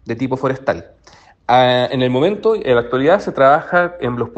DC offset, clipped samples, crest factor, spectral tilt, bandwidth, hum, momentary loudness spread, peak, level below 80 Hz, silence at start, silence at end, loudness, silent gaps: under 0.1%; under 0.1%; 16 dB; -7 dB/octave; 8.4 kHz; none; 9 LU; 0 dBFS; -50 dBFS; 0.05 s; 0.1 s; -15 LUFS; none